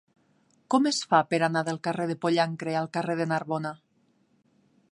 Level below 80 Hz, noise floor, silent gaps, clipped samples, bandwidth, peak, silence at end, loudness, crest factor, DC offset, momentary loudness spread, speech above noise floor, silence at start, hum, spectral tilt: -76 dBFS; -68 dBFS; none; under 0.1%; 11.5 kHz; -8 dBFS; 1.15 s; -27 LUFS; 20 dB; under 0.1%; 8 LU; 41 dB; 0.7 s; none; -5 dB/octave